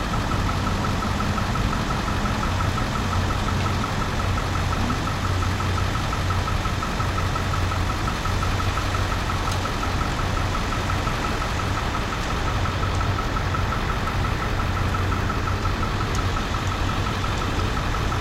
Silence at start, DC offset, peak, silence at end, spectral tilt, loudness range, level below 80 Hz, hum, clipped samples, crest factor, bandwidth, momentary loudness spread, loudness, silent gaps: 0 s; under 0.1%; -10 dBFS; 0 s; -5 dB/octave; 1 LU; -30 dBFS; none; under 0.1%; 14 dB; 16 kHz; 1 LU; -24 LUFS; none